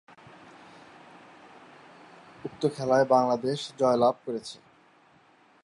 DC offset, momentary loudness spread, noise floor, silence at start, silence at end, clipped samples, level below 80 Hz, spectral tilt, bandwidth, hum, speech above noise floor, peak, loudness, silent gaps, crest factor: under 0.1%; 20 LU; -60 dBFS; 2.45 s; 1.1 s; under 0.1%; -72 dBFS; -5.5 dB/octave; 11.5 kHz; none; 35 dB; -8 dBFS; -26 LUFS; none; 22 dB